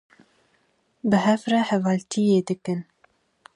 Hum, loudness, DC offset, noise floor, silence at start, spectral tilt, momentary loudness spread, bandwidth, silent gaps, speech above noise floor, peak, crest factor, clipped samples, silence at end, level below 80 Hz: none; -23 LUFS; under 0.1%; -67 dBFS; 1.05 s; -6 dB/octave; 10 LU; 11 kHz; none; 45 dB; -8 dBFS; 18 dB; under 0.1%; 0.75 s; -68 dBFS